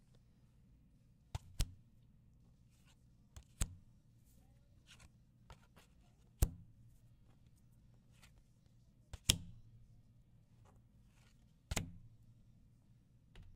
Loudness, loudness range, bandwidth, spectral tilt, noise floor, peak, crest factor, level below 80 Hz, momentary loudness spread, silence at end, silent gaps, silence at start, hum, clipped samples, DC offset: -42 LUFS; 10 LU; 15.5 kHz; -3 dB/octave; -68 dBFS; -10 dBFS; 40 dB; -52 dBFS; 28 LU; 0 s; none; 1.35 s; none; under 0.1%; under 0.1%